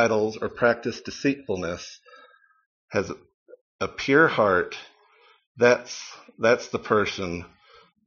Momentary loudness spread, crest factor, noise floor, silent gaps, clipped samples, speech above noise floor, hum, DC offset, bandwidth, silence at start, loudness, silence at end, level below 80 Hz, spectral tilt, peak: 17 LU; 22 dB; -59 dBFS; 2.66-2.88 s, 3.34-3.46 s, 3.61-3.79 s, 5.47-5.55 s; under 0.1%; 35 dB; none; under 0.1%; 7.2 kHz; 0 s; -24 LUFS; 0.6 s; -60 dBFS; -3.5 dB/octave; -4 dBFS